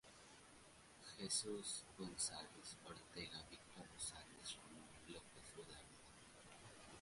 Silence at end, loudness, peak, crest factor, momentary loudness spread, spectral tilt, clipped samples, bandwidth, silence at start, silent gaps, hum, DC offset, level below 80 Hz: 0 s; -51 LUFS; -30 dBFS; 24 dB; 19 LU; -2 dB/octave; under 0.1%; 11.5 kHz; 0.05 s; none; none; under 0.1%; -74 dBFS